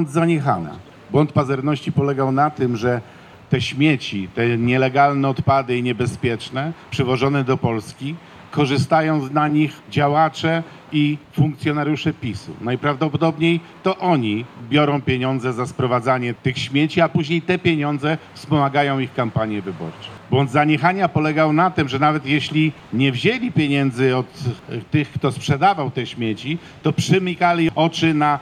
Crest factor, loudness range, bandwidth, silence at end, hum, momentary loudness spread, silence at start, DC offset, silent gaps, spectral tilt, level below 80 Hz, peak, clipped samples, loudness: 18 dB; 3 LU; 12.5 kHz; 0 s; none; 9 LU; 0 s; under 0.1%; none; -6.5 dB/octave; -56 dBFS; -2 dBFS; under 0.1%; -19 LUFS